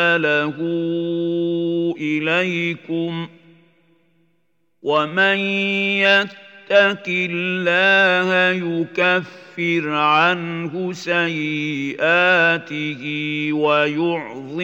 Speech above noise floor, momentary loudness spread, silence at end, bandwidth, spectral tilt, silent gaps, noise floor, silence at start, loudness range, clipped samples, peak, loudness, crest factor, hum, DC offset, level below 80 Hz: 50 dB; 11 LU; 0 s; 8 kHz; -5.5 dB/octave; none; -69 dBFS; 0 s; 6 LU; under 0.1%; -2 dBFS; -18 LUFS; 18 dB; none; under 0.1%; -80 dBFS